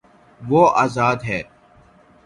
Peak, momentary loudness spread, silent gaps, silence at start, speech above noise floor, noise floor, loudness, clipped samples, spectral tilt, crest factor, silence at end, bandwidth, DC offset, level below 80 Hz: 0 dBFS; 20 LU; none; 0.4 s; 34 dB; -51 dBFS; -18 LUFS; under 0.1%; -6.5 dB/octave; 20 dB; 0.85 s; 11.5 kHz; under 0.1%; -52 dBFS